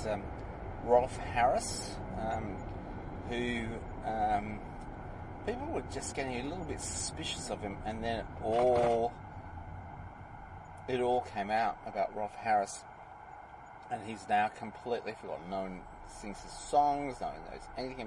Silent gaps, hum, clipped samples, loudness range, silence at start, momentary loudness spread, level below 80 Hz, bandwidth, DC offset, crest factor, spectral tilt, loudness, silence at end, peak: none; none; under 0.1%; 4 LU; 0 s; 18 LU; -50 dBFS; 11.5 kHz; under 0.1%; 22 dB; -4.5 dB/octave; -35 LUFS; 0 s; -14 dBFS